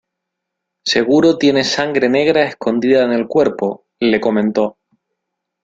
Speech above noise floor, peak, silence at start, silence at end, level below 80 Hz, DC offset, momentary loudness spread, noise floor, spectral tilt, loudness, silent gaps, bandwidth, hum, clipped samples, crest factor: 64 dB; 0 dBFS; 0.85 s; 0.9 s; -56 dBFS; under 0.1%; 7 LU; -78 dBFS; -5 dB/octave; -15 LUFS; none; 7.8 kHz; none; under 0.1%; 16 dB